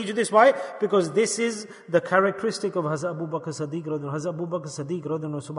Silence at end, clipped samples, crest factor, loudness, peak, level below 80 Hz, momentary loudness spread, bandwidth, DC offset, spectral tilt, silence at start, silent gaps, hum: 0 s; under 0.1%; 20 dB; -25 LUFS; -4 dBFS; -72 dBFS; 12 LU; 11 kHz; under 0.1%; -5 dB/octave; 0 s; none; none